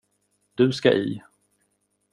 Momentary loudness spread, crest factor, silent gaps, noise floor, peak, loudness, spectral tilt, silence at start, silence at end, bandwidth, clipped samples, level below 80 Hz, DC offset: 19 LU; 22 dB; none; -72 dBFS; -4 dBFS; -22 LUFS; -6.5 dB/octave; 0.6 s; 0.95 s; 11 kHz; under 0.1%; -66 dBFS; under 0.1%